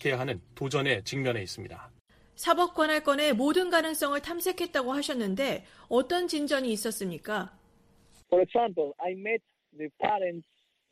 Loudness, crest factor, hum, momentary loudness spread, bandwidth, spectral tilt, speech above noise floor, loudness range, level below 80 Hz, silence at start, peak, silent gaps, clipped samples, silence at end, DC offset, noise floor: -29 LUFS; 20 dB; none; 10 LU; 15.5 kHz; -4 dB/octave; 33 dB; 4 LU; -64 dBFS; 0 s; -10 dBFS; 2.01-2.05 s; under 0.1%; 0.5 s; under 0.1%; -62 dBFS